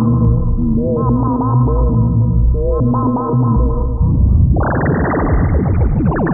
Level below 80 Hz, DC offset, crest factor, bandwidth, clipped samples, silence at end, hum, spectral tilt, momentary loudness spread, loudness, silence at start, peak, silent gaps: -18 dBFS; under 0.1%; 10 dB; 2.5 kHz; under 0.1%; 0 s; none; -15.5 dB/octave; 3 LU; -15 LUFS; 0 s; -2 dBFS; none